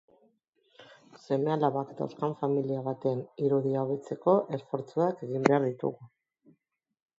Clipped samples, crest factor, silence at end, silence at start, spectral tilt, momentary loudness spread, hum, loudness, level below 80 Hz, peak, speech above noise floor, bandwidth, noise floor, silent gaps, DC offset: under 0.1%; 28 dB; 1.15 s; 0.8 s; -8 dB/octave; 9 LU; none; -30 LUFS; -80 dBFS; -4 dBFS; 49 dB; 7.8 kHz; -78 dBFS; none; under 0.1%